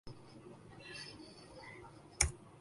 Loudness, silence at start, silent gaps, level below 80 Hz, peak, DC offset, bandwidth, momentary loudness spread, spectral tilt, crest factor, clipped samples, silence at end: -39 LUFS; 0.05 s; none; -52 dBFS; -6 dBFS; under 0.1%; 11.5 kHz; 21 LU; -2 dB/octave; 38 dB; under 0.1%; 0 s